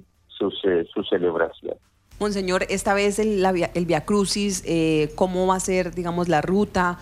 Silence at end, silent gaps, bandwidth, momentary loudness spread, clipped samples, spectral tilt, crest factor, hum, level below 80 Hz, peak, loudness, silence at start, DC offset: 0 s; none; 15.5 kHz; 6 LU; under 0.1%; -5 dB/octave; 16 dB; none; -46 dBFS; -6 dBFS; -22 LUFS; 0.3 s; under 0.1%